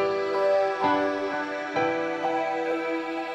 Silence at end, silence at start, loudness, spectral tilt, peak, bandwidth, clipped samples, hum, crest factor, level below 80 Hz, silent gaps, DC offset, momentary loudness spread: 0 s; 0 s; -26 LUFS; -5 dB/octave; -12 dBFS; 8.8 kHz; under 0.1%; none; 14 dB; -72 dBFS; none; under 0.1%; 6 LU